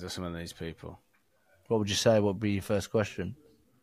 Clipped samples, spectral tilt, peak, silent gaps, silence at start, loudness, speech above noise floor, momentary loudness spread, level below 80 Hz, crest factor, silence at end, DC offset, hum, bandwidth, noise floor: under 0.1%; -5 dB/octave; -12 dBFS; none; 0 s; -30 LUFS; 38 dB; 16 LU; -58 dBFS; 20 dB; 0.5 s; under 0.1%; none; 15.5 kHz; -68 dBFS